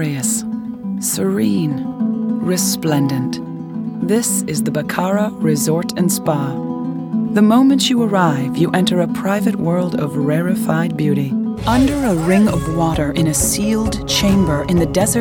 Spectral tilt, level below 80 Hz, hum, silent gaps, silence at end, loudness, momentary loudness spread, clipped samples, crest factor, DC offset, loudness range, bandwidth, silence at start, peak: -5 dB/octave; -36 dBFS; none; none; 0 s; -17 LUFS; 7 LU; under 0.1%; 16 dB; under 0.1%; 3 LU; 19.5 kHz; 0 s; 0 dBFS